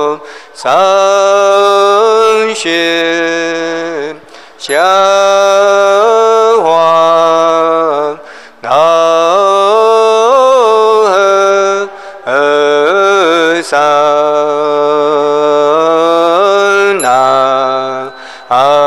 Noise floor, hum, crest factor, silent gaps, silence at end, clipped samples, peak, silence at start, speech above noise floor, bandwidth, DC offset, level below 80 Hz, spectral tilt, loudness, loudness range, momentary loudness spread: -33 dBFS; none; 8 dB; none; 0 s; 0.7%; 0 dBFS; 0 s; 24 dB; 13.5 kHz; 0.5%; -60 dBFS; -3 dB/octave; -8 LUFS; 2 LU; 9 LU